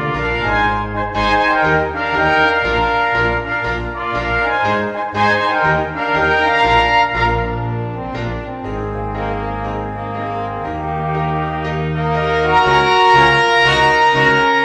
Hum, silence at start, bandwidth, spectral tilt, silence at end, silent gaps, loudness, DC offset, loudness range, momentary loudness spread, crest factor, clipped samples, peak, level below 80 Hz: none; 0 s; 9.8 kHz; -5.5 dB/octave; 0 s; none; -15 LUFS; under 0.1%; 9 LU; 12 LU; 16 dB; under 0.1%; 0 dBFS; -32 dBFS